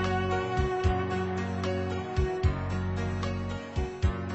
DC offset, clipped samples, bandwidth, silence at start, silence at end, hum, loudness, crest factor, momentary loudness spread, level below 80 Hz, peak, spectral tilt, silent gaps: under 0.1%; under 0.1%; 8.4 kHz; 0 s; 0 s; none; -31 LUFS; 16 dB; 5 LU; -36 dBFS; -14 dBFS; -7 dB/octave; none